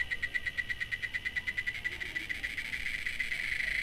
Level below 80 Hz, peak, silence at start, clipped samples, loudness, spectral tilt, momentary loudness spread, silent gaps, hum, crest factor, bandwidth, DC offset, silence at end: -52 dBFS; -20 dBFS; 0 s; under 0.1%; -34 LUFS; -1.5 dB/octave; 3 LU; none; none; 16 dB; 16 kHz; under 0.1%; 0 s